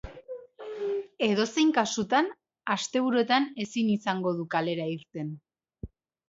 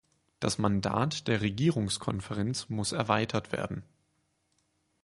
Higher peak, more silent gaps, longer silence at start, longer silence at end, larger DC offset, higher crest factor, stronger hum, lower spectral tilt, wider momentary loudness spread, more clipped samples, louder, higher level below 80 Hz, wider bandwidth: about the same, -8 dBFS vs -10 dBFS; neither; second, 0.05 s vs 0.4 s; second, 0.4 s vs 1.2 s; neither; about the same, 20 dB vs 22 dB; neither; about the same, -4.5 dB/octave vs -5 dB/octave; first, 19 LU vs 7 LU; neither; first, -28 LUFS vs -31 LUFS; about the same, -58 dBFS vs -56 dBFS; second, 8 kHz vs 11.5 kHz